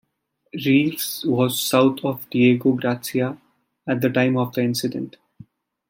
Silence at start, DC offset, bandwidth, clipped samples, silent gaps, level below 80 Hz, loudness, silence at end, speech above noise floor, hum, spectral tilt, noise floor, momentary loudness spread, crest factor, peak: 0.55 s; under 0.1%; 17 kHz; under 0.1%; none; -66 dBFS; -21 LUFS; 0.8 s; 50 dB; none; -5.5 dB/octave; -71 dBFS; 11 LU; 18 dB; -4 dBFS